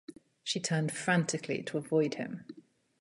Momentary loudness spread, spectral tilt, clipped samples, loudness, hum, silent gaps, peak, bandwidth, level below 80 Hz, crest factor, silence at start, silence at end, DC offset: 15 LU; -4.5 dB/octave; under 0.1%; -33 LUFS; none; none; -14 dBFS; 11.5 kHz; -76 dBFS; 20 dB; 0.1 s; 0.4 s; under 0.1%